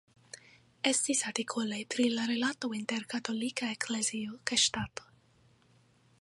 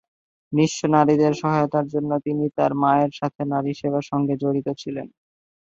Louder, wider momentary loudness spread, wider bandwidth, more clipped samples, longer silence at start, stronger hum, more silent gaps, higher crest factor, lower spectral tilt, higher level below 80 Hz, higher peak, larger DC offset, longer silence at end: second, -32 LUFS vs -22 LUFS; first, 15 LU vs 9 LU; first, 11.5 kHz vs 7.8 kHz; neither; second, 0.35 s vs 0.5 s; neither; second, none vs 3.35-3.39 s; about the same, 24 dB vs 20 dB; second, -2 dB/octave vs -7 dB/octave; second, -68 dBFS vs -62 dBFS; second, -10 dBFS vs -2 dBFS; neither; first, 1.2 s vs 0.7 s